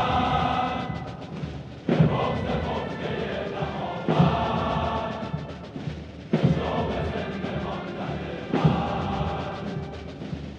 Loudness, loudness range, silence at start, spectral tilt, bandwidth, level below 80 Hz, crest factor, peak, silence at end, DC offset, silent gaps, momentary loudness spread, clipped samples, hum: -27 LUFS; 3 LU; 0 s; -7.5 dB/octave; 7.8 kHz; -44 dBFS; 20 dB; -8 dBFS; 0 s; under 0.1%; none; 13 LU; under 0.1%; none